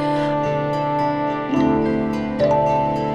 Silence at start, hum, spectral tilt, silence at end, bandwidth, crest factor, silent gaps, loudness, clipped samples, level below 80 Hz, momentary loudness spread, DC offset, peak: 0 s; none; -8 dB/octave; 0 s; 10 kHz; 12 dB; none; -20 LUFS; under 0.1%; -44 dBFS; 4 LU; under 0.1%; -6 dBFS